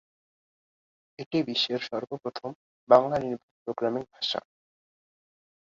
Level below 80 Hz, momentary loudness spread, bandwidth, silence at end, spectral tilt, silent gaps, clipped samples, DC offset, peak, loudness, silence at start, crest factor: -68 dBFS; 16 LU; 7.6 kHz; 1.35 s; -5.5 dB/octave; 1.26-1.31 s, 2.55-2.87 s, 3.43-3.66 s; under 0.1%; under 0.1%; -4 dBFS; -28 LUFS; 1.2 s; 26 dB